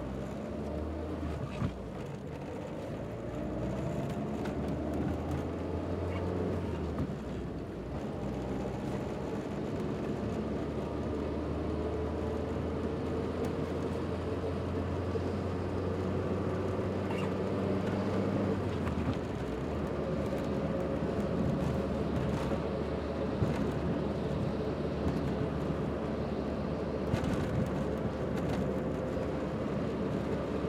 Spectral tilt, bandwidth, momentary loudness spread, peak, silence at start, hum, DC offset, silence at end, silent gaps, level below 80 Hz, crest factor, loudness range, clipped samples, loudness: -8 dB/octave; 14 kHz; 5 LU; -16 dBFS; 0 s; none; under 0.1%; 0 s; none; -48 dBFS; 18 dB; 4 LU; under 0.1%; -35 LUFS